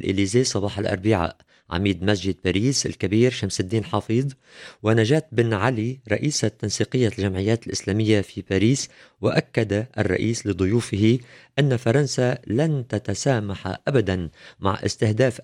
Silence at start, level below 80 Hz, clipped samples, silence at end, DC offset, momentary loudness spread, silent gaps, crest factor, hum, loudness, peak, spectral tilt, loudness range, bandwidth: 0 s; -52 dBFS; under 0.1%; 0 s; under 0.1%; 7 LU; none; 18 dB; none; -23 LUFS; -4 dBFS; -5.5 dB/octave; 1 LU; 12.5 kHz